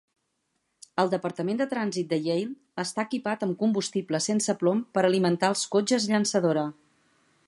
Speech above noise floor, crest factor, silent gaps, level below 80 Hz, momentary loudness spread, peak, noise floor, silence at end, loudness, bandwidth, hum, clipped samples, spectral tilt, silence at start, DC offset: 51 dB; 20 dB; none; -76 dBFS; 7 LU; -8 dBFS; -77 dBFS; 0.75 s; -27 LUFS; 11.5 kHz; none; under 0.1%; -4.5 dB/octave; 0.95 s; under 0.1%